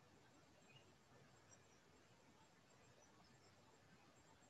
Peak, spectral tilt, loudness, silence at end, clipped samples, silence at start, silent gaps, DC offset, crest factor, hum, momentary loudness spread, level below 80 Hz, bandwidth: -54 dBFS; -3.5 dB/octave; -69 LUFS; 0 s; under 0.1%; 0 s; none; under 0.1%; 16 dB; none; 1 LU; -88 dBFS; 10 kHz